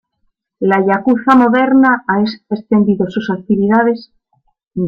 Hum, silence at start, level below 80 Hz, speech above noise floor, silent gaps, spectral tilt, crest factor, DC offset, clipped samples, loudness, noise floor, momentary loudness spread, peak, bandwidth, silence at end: none; 0.6 s; -54 dBFS; 52 dB; 4.67-4.71 s; -8.5 dB/octave; 12 dB; under 0.1%; under 0.1%; -13 LUFS; -65 dBFS; 10 LU; 0 dBFS; 6.4 kHz; 0 s